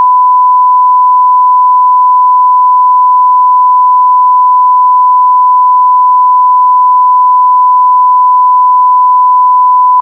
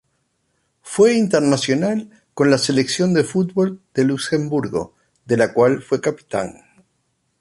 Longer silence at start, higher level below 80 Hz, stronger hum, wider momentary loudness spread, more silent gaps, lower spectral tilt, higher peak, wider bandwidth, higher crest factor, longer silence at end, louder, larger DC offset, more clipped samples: second, 0 s vs 0.85 s; second, under -90 dBFS vs -58 dBFS; neither; second, 0 LU vs 10 LU; neither; second, 8 dB/octave vs -5.5 dB/octave; about the same, -2 dBFS vs -2 dBFS; second, 1.2 kHz vs 11.5 kHz; second, 4 dB vs 18 dB; second, 0 s vs 0.9 s; first, -5 LUFS vs -18 LUFS; neither; neither